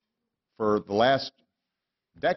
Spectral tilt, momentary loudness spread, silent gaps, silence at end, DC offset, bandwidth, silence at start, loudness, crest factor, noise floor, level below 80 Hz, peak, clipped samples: -6 dB/octave; 8 LU; none; 0 s; under 0.1%; 6.2 kHz; 0.6 s; -26 LUFS; 20 dB; -86 dBFS; -64 dBFS; -8 dBFS; under 0.1%